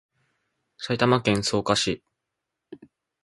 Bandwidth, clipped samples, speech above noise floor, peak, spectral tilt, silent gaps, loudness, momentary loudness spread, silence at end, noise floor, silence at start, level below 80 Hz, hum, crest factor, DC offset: 11.5 kHz; under 0.1%; 60 dB; -4 dBFS; -4.5 dB/octave; none; -23 LUFS; 12 LU; 0.45 s; -83 dBFS; 0.8 s; -56 dBFS; none; 24 dB; under 0.1%